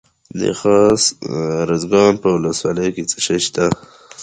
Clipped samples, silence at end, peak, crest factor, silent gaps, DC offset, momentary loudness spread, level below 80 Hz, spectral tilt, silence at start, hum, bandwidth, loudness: under 0.1%; 0 s; 0 dBFS; 16 dB; none; under 0.1%; 9 LU; -48 dBFS; -4 dB/octave; 0.35 s; none; 9.6 kHz; -16 LUFS